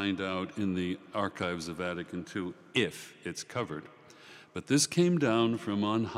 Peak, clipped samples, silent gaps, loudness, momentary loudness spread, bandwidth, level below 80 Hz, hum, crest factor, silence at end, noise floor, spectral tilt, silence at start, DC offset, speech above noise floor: -14 dBFS; under 0.1%; none; -32 LUFS; 15 LU; 15.5 kHz; -72 dBFS; none; 18 dB; 0 s; -54 dBFS; -4.5 dB/octave; 0 s; under 0.1%; 22 dB